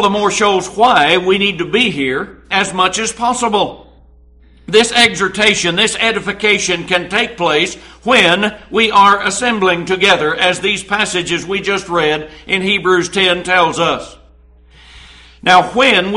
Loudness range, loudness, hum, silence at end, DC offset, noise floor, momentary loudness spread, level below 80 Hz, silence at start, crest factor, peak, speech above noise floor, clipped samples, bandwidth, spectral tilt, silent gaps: 3 LU; -13 LUFS; none; 0 s; under 0.1%; -44 dBFS; 7 LU; -44 dBFS; 0 s; 14 dB; 0 dBFS; 31 dB; under 0.1%; 11.5 kHz; -3 dB/octave; none